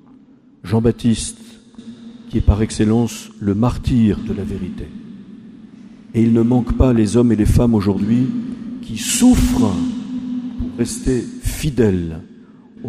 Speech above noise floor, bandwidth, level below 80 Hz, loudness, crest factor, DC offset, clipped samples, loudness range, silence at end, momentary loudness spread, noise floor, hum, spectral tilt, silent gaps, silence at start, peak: 31 dB; 15.5 kHz; -28 dBFS; -17 LUFS; 18 dB; under 0.1%; under 0.1%; 4 LU; 0 s; 19 LU; -47 dBFS; none; -6.5 dB/octave; none; 0.65 s; 0 dBFS